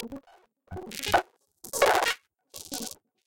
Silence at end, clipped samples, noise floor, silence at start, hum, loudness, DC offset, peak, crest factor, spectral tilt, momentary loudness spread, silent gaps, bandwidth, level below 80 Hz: 0.35 s; under 0.1%; -60 dBFS; 0 s; none; -28 LUFS; under 0.1%; -6 dBFS; 24 dB; -2 dB/octave; 23 LU; none; 17 kHz; -58 dBFS